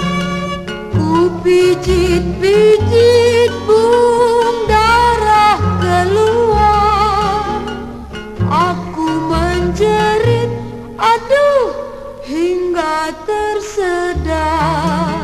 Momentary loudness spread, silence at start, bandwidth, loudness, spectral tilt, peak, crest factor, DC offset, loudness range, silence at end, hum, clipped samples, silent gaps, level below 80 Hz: 10 LU; 0 s; 13 kHz; -13 LUFS; -6 dB/octave; 0 dBFS; 12 dB; under 0.1%; 5 LU; 0 s; none; under 0.1%; none; -28 dBFS